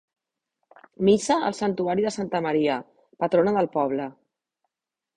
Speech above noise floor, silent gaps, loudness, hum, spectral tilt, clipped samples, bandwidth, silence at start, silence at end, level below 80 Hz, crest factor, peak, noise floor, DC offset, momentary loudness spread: 65 dB; none; -24 LUFS; none; -5.5 dB/octave; under 0.1%; 10.5 kHz; 1 s; 1.05 s; -62 dBFS; 18 dB; -8 dBFS; -88 dBFS; under 0.1%; 8 LU